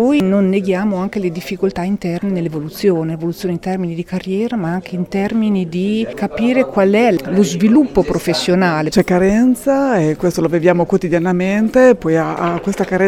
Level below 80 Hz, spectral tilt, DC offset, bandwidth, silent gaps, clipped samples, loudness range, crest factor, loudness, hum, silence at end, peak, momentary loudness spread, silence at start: -42 dBFS; -6.5 dB/octave; under 0.1%; 15.5 kHz; none; under 0.1%; 6 LU; 14 dB; -15 LUFS; none; 0 s; 0 dBFS; 9 LU; 0 s